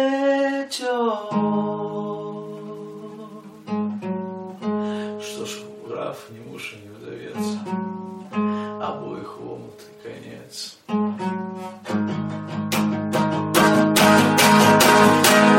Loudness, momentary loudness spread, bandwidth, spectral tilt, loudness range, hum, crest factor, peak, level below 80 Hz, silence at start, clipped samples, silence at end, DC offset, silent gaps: -20 LUFS; 24 LU; 16.5 kHz; -4 dB/octave; 13 LU; none; 20 dB; 0 dBFS; -60 dBFS; 0 s; under 0.1%; 0 s; under 0.1%; none